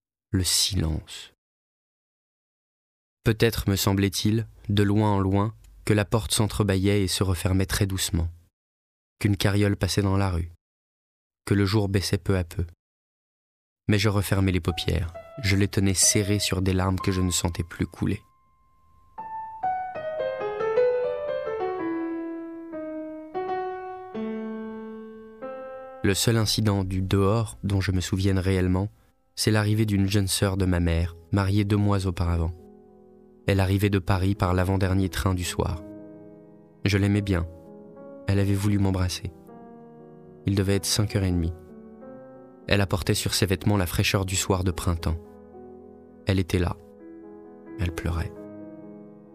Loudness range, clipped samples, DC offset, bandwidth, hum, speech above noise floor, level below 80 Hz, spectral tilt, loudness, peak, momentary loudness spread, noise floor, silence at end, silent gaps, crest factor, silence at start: 7 LU; under 0.1%; under 0.1%; 15.5 kHz; none; 40 dB; -42 dBFS; -5 dB/octave; -25 LUFS; -4 dBFS; 17 LU; -64 dBFS; 0.15 s; 1.38-3.17 s, 8.53-9.16 s, 10.61-11.30 s, 12.79-13.76 s; 22 dB; 0.3 s